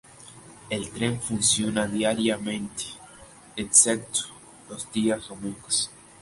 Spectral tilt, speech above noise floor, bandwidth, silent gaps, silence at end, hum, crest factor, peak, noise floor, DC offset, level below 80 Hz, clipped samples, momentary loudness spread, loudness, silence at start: -2.5 dB/octave; 23 dB; 11.5 kHz; none; 0.3 s; none; 24 dB; -4 dBFS; -49 dBFS; under 0.1%; -58 dBFS; under 0.1%; 20 LU; -24 LUFS; 0.2 s